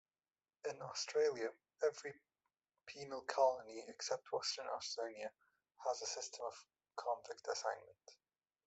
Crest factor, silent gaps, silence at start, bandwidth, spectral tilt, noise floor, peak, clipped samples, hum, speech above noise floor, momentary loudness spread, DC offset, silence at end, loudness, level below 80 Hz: 22 dB; none; 0.65 s; 8.2 kHz; -1.5 dB/octave; under -90 dBFS; -22 dBFS; under 0.1%; none; over 48 dB; 16 LU; under 0.1%; 0.5 s; -43 LUFS; -90 dBFS